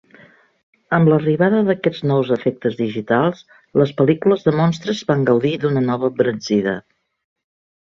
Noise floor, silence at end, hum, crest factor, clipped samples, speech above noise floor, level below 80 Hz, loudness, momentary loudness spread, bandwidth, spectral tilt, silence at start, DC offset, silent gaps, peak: -49 dBFS; 1.05 s; none; 16 dB; under 0.1%; 32 dB; -58 dBFS; -18 LUFS; 7 LU; 7.4 kHz; -7.5 dB/octave; 0.9 s; under 0.1%; none; -2 dBFS